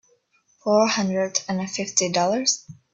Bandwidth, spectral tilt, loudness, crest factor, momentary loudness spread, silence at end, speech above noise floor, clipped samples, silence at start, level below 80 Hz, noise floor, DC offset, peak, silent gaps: 8.4 kHz; -3 dB/octave; -22 LUFS; 20 dB; 8 LU; 0.2 s; 41 dB; under 0.1%; 0.65 s; -66 dBFS; -64 dBFS; under 0.1%; -4 dBFS; none